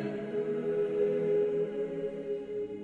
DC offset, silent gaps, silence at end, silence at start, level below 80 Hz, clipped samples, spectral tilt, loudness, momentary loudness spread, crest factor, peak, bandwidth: under 0.1%; none; 0 s; 0 s; -68 dBFS; under 0.1%; -8.5 dB/octave; -32 LUFS; 8 LU; 12 dB; -18 dBFS; 4.5 kHz